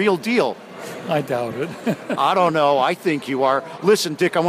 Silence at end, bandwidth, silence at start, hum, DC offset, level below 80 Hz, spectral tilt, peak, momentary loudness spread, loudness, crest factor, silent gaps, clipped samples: 0 s; 15.5 kHz; 0 s; none; under 0.1%; -66 dBFS; -5 dB/octave; -6 dBFS; 9 LU; -20 LUFS; 14 dB; none; under 0.1%